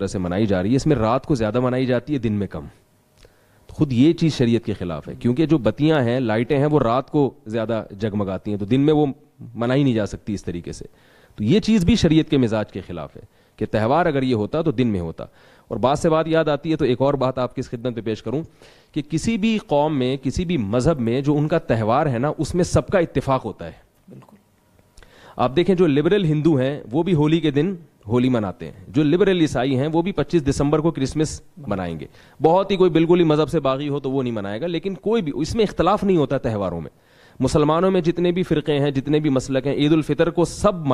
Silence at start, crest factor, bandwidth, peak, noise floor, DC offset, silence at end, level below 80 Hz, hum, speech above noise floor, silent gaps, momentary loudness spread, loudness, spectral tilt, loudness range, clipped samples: 0 s; 16 dB; 12 kHz; -4 dBFS; -57 dBFS; under 0.1%; 0 s; -42 dBFS; none; 37 dB; none; 12 LU; -20 LUFS; -7 dB/octave; 3 LU; under 0.1%